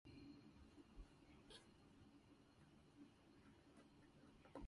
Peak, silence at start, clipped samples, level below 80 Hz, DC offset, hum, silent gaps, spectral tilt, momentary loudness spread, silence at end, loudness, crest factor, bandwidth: -42 dBFS; 0.05 s; under 0.1%; -72 dBFS; under 0.1%; none; none; -5.5 dB/octave; 6 LU; 0 s; -67 LUFS; 22 dB; 11 kHz